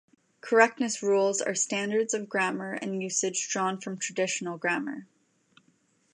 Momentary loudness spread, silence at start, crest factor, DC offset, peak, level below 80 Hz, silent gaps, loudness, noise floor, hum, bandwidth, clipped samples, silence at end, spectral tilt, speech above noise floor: 10 LU; 0.45 s; 24 dB; under 0.1%; -6 dBFS; -84 dBFS; none; -28 LUFS; -68 dBFS; none; 11.5 kHz; under 0.1%; 1.1 s; -3 dB/octave; 40 dB